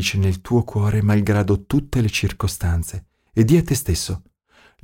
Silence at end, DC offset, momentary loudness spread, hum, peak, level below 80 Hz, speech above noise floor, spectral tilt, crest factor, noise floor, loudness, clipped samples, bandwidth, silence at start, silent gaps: 0.65 s; under 0.1%; 10 LU; none; -4 dBFS; -34 dBFS; 36 dB; -6 dB/octave; 16 dB; -55 dBFS; -20 LUFS; under 0.1%; 17 kHz; 0 s; none